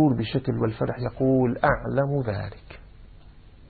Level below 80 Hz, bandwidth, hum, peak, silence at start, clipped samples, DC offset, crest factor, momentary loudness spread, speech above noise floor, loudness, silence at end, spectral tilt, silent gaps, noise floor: -44 dBFS; 4.7 kHz; none; -6 dBFS; 0 s; under 0.1%; under 0.1%; 18 dB; 10 LU; 24 dB; -25 LUFS; 0.05 s; -12 dB/octave; none; -48 dBFS